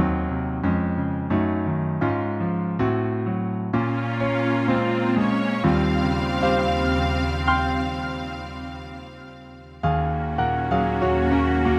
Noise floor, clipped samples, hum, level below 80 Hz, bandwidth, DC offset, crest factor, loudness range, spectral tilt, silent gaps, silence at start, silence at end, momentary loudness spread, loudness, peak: -42 dBFS; under 0.1%; none; -34 dBFS; 9.6 kHz; under 0.1%; 16 dB; 5 LU; -8 dB/octave; none; 0 s; 0 s; 12 LU; -23 LUFS; -6 dBFS